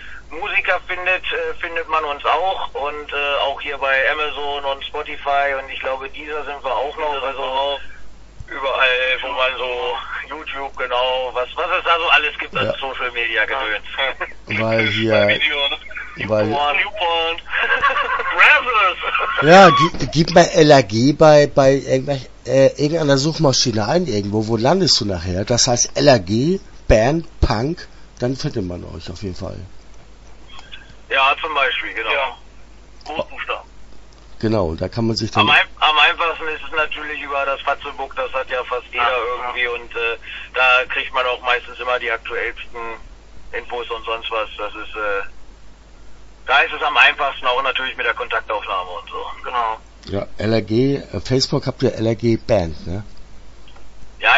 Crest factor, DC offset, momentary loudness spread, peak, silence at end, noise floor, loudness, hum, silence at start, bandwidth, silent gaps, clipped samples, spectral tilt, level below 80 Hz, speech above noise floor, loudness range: 18 dB; under 0.1%; 14 LU; 0 dBFS; 0 s; -40 dBFS; -17 LUFS; none; 0 s; 8 kHz; none; under 0.1%; -4 dB/octave; -38 dBFS; 22 dB; 10 LU